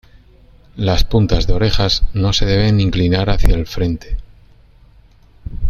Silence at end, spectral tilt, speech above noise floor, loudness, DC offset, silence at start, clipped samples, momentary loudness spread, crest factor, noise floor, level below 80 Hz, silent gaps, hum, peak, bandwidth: 0 s; -6 dB/octave; 33 dB; -16 LUFS; under 0.1%; 0.75 s; under 0.1%; 16 LU; 16 dB; -46 dBFS; -20 dBFS; none; none; 0 dBFS; 14 kHz